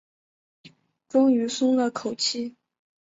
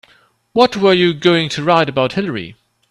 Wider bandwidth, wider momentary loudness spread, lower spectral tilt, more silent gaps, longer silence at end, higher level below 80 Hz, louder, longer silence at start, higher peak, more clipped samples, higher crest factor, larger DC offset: second, 7.8 kHz vs 11.5 kHz; about the same, 9 LU vs 11 LU; second, -3.5 dB/octave vs -5.5 dB/octave; neither; first, 0.55 s vs 0.4 s; second, -74 dBFS vs -54 dBFS; second, -24 LUFS vs -14 LUFS; about the same, 0.65 s vs 0.55 s; second, -10 dBFS vs 0 dBFS; neither; about the same, 16 dB vs 16 dB; neither